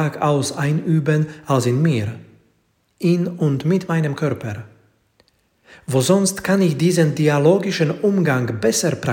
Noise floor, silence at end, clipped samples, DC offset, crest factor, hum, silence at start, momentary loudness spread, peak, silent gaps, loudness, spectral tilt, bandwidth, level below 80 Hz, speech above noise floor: -64 dBFS; 0 s; under 0.1%; under 0.1%; 16 dB; none; 0 s; 7 LU; -2 dBFS; none; -18 LUFS; -6 dB/octave; 17 kHz; -58 dBFS; 46 dB